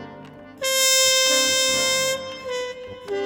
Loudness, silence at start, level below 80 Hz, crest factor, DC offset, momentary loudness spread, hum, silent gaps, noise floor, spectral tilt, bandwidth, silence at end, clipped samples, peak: -18 LUFS; 0 s; -62 dBFS; 18 dB; under 0.1%; 15 LU; none; none; -41 dBFS; 0.5 dB/octave; over 20 kHz; 0 s; under 0.1%; -4 dBFS